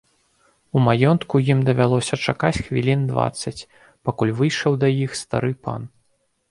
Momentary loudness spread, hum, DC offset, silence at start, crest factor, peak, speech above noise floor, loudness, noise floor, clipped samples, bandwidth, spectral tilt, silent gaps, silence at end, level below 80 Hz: 12 LU; none; under 0.1%; 0.75 s; 20 dB; -2 dBFS; 47 dB; -21 LUFS; -67 dBFS; under 0.1%; 11.5 kHz; -6.5 dB/octave; none; 0.65 s; -48 dBFS